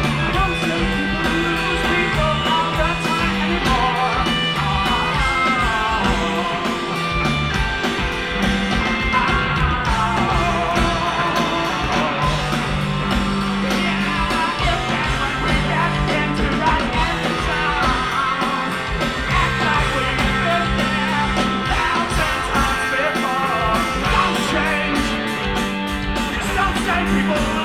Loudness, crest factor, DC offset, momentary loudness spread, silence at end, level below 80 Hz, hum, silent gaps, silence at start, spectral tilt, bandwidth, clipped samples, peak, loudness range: -19 LUFS; 16 dB; 0.2%; 3 LU; 0 s; -28 dBFS; none; none; 0 s; -4.5 dB/octave; 16 kHz; under 0.1%; -4 dBFS; 1 LU